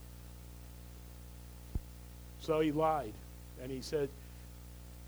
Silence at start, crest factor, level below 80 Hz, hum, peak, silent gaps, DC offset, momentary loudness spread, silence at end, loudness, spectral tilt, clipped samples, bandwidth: 0 s; 20 dB; -50 dBFS; 60 Hz at -50 dBFS; -20 dBFS; none; under 0.1%; 19 LU; 0 s; -37 LUFS; -6 dB/octave; under 0.1%; over 20 kHz